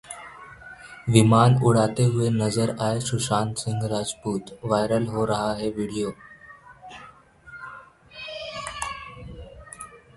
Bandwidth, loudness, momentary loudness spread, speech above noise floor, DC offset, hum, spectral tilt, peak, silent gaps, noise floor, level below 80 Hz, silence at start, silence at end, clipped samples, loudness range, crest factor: 11.5 kHz; -23 LUFS; 24 LU; 27 dB; under 0.1%; none; -6 dB/octave; -2 dBFS; none; -49 dBFS; -52 dBFS; 0.1 s; 0.2 s; under 0.1%; 16 LU; 24 dB